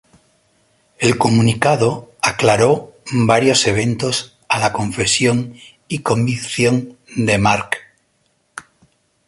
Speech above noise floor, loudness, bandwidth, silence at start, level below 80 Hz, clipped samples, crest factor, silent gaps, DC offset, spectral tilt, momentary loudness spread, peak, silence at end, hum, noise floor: 47 dB; -16 LUFS; 11.5 kHz; 1 s; -46 dBFS; under 0.1%; 16 dB; none; under 0.1%; -4.5 dB/octave; 12 LU; 0 dBFS; 0.65 s; none; -63 dBFS